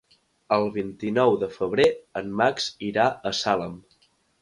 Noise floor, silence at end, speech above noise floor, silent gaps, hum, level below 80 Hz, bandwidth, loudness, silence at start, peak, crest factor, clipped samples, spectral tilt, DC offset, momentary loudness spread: -64 dBFS; 0.6 s; 40 dB; none; none; -60 dBFS; 11.5 kHz; -24 LUFS; 0.5 s; -6 dBFS; 18 dB; under 0.1%; -4.5 dB/octave; under 0.1%; 9 LU